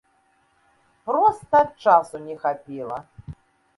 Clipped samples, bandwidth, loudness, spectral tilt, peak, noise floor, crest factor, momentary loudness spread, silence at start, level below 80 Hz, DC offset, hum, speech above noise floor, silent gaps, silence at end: under 0.1%; 11.5 kHz; -21 LUFS; -6 dB/octave; -2 dBFS; -64 dBFS; 20 dB; 22 LU; 1.05 s; -58 dBFS; under 0.1%; none; 43 dB; none; 0.45 s